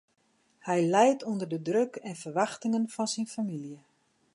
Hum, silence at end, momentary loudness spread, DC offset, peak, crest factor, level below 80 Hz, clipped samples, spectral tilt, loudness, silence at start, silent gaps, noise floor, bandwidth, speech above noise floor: none; 0.6 s; 15 LU; under 0.1%; -10 dBFS; 20 dB; -82 dBFS; under 0.1%; -5 dB/octave; -29 LUFS; 0.65 s; none; -70 dBFS; 11.5 kHz; 42 dB